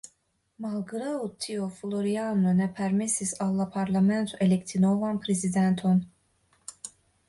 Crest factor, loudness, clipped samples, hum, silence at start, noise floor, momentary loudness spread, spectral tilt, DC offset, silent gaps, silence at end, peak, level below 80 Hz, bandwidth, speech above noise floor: 14 dB; -27 LUFS; under 0.1%; none; 0.6 s; -71 dBFS; 16 LU; -6 dB/octave; under 0.1%; none; 0.4 s; -14 dBFS; -64 dBFS; 11.5 kHz; 45 dB